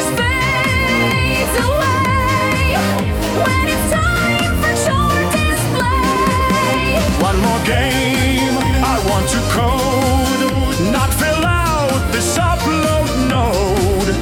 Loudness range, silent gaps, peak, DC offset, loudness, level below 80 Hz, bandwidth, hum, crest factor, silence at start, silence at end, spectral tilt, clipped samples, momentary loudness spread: 1 LU; none; -2 dBFS; under 0.1%; -15 LUFS; -24 dBFS; 18 kHz; none; 12 dB; 0 s; 0 s; -4.5 dB/octave; under 0.1%; 2 LU